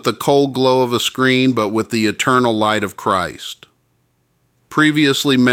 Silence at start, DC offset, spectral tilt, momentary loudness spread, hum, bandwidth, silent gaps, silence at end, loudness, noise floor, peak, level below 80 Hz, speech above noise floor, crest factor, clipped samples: 0.05 s; under 0.1%; -4.5 dB/octave; 8 LU; none; 17 kHz; none; 0 s; -15 LUFS; -62 dBFS; -2 dBFS; -56 dBFS; 47 dB; 16 dB; under 0.1%